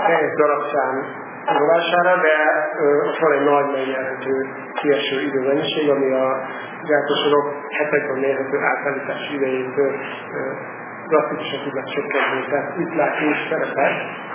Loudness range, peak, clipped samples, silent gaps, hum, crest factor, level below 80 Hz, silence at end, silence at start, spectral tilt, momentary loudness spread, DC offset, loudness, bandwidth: 5 LU; -2 dBFS; under 0.1%; none; none; 18 dB; -76 dBFS; 0 s; 0 s; -8.5 dB/octave; 10 LU; under 0.1%; -20 LUFS; 3.6 kHz